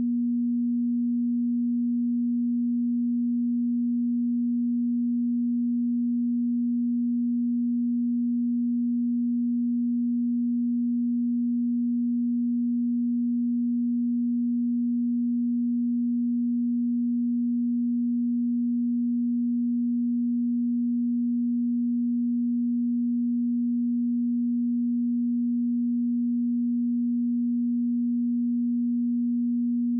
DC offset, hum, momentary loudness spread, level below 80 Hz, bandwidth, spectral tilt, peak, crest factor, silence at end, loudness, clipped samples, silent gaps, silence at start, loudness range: under 0.1%; none; 0 LU; under -90 dBFS; 0.3 kHz; -20.5 dB/octave; -22 dBFS; 4 dB; 0 s; -26 LUFS; under 0.1%; none; 0 s; 0 LU